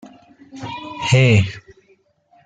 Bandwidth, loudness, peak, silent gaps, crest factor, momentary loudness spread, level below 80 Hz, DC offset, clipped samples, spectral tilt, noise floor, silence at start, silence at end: 9.2 kHz; -16 LUFS; -2 dBFS; none; 18 dB; 21 LU; -50 dBFS; under 0.1%; under 0.1%; -6 dB/octave; -58 dBFS; 0.55 s; 0.85 s